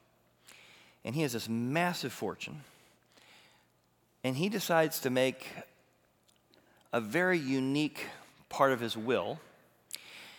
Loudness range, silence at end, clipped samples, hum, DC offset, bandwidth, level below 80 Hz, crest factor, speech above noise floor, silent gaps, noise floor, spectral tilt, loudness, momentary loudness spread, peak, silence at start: 4 LU; 0 s; under 0.1%; none; under 0.1%; over 20 kHz; -80 dBFS; 24 dB; 39 dB; none; -71 dBFS; -5 dB/octave; -32 LUFS; 17 LU; -12 dBFS; 0.5 s